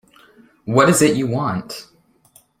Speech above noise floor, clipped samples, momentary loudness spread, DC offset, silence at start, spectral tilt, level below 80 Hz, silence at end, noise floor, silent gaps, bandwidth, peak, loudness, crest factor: 38 dB; under 0.1%; 20 LU; under 0.1%; 0.65 s; -5 dB/octave; -56 dBFS; 0.75 s; -54 dBFS; none; 16.5 kHz; -2 dBFS; -17 LUFS; 18 dB